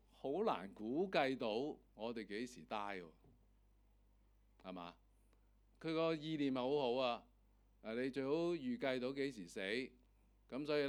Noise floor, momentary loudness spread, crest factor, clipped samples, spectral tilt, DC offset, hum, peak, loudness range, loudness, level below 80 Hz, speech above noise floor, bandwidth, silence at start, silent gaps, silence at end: -72 dBFS; 14 LU; 22 dB; under 0.1%; -6 dB/octave; under 0.1%; none; -20 dBFS; 10 LU; -42 LUFS; -72 dBFS; 30 dB; 18 kHz; 0.25 s; none; 0 s